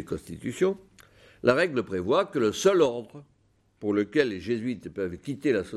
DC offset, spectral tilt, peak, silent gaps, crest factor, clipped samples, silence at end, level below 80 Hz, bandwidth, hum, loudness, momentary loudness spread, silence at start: under 0.1%; -5.5 dB/octave; -6 dBFS; none; 20 dB; under 0.1%; 0 s; -60 dBFS; 13.5 kHz; none; -27 LUFS; 13 LU; 0 s